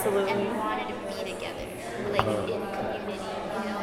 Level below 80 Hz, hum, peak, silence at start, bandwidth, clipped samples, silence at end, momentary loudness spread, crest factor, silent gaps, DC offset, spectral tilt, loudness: -54 dBFS; none; -4 dBFS; 0 s; 16 kHz; under 0.1%; 0 s; 8 LU; 26 dB; none; under 0.1%; -5 dB/octave; -30 LUFS